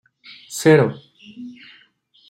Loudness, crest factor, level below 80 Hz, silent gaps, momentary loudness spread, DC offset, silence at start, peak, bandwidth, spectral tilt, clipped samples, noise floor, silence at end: -16 LUFS; 20 dB; -64 dBFS; none; 24 LU; under 0.1%; 0.5 s; -2 dBFS; 16 kHz; -6 dB/octave; under 0.1%; -56 dBFS; 0.8 s